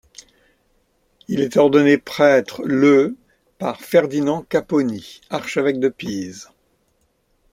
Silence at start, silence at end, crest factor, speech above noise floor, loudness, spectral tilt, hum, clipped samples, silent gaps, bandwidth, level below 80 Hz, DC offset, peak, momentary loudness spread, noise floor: 1.3 s; 1.1 s; 18 dB; 47 dB; -18 LUFS; -6 dB/octave; none; under 0.1%; none; 15.5 kHz; -60 dBFS; under 0.1%; -2 dBFS; 14 LU; -65 dBFS